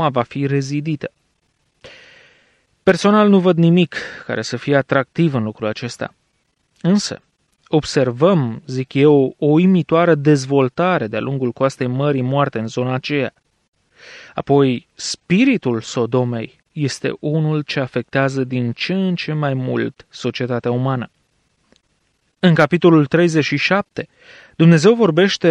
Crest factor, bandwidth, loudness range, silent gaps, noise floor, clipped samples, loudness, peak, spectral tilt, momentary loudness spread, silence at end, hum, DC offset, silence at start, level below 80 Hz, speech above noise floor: 16 dB; 10 kHz; 6 LU; 13.68-13.73 s; -66 dBFS; under 0.1%; -17 LUFS; -2 dBFS; -6.5 dB/octave; 12 LU; 0 s; none; under 0.1%; 0 s; -58 dBFS; 49 dB